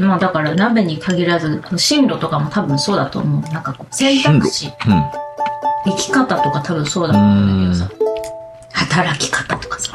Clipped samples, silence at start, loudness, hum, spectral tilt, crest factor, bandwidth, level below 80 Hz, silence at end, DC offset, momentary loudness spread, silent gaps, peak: under 0.1%; 0 s; -16 LUFS; none; -5 dB/octave; 14 dB; 13 kHz; -46 dBFS; 0 s; under 0.1%; 10 LU; none; -2 dBFS